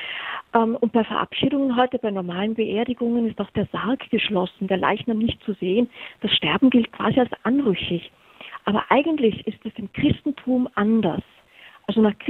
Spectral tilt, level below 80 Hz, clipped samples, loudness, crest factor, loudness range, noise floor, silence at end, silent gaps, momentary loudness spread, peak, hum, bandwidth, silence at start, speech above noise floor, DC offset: -8.5 dB/octave; -54 dBFS; under 0.1%; -22 LUFS; 22 dB; 2 LU; -49 dBFS; 0 s; none; 10 LU; -2 dBFS; none; 4.2 kHz; 0 s; 28 dB; under 0.1%